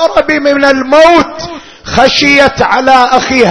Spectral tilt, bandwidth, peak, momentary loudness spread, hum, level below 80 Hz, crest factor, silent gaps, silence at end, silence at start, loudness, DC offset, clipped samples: -4 dB/octave; 11 kHz; 0 dBFS; 12 LU; none; -34 dBFS; 8 dB; none; 0 s; 0 s; -7 LUFS; under 0.1%; 4%